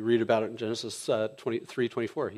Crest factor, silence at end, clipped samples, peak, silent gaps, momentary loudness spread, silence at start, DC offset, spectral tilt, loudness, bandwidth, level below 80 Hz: 18 dB; 0 s; under 0.1%; -12 dBFS; none; 8 LU; 0 s; under 0.1%; -5 dB/octave; -30 LUFS; 12.5 kHz; -76 dBFS